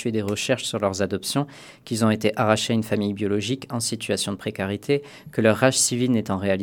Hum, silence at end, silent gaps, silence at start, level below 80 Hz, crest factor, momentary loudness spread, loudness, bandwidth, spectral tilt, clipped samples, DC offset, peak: none; 0 s; none; 0 s; -62 dBFS; 22 dB; 9 LU; -23 LUFS; 18 kHz; -4.5 dB/octave; under 0.1%; under 0.1%; -2 dBFS